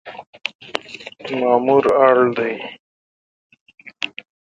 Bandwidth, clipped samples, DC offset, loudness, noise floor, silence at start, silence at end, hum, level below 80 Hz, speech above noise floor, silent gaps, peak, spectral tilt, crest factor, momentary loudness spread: 9.2 kHz; under 0.1%; under 0.1%; -18 LUFS; -36 dBFS; 0.05 s; 0.4 s; none; -62 dBFS; 20 dB; 0.27-0.33 s, 0.55-0.59 s, 2.80-3.50 s, 3.61-3.66 s; 0 dBFS; -5.5 dB/octave; 20 dB; 19 LU